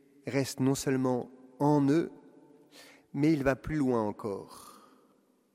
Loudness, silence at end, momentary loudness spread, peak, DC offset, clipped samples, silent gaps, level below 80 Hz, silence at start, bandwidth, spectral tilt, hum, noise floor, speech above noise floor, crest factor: -30 LUFS; 0.85 s; 15 LU; -12 dBFS; under 0.1%; under 0.1%; none; -58 dBFS; 0.25 s; 15.5 kHz; -6.5 dB/octave; none; -67 dBFS; 38 dB; 20 dB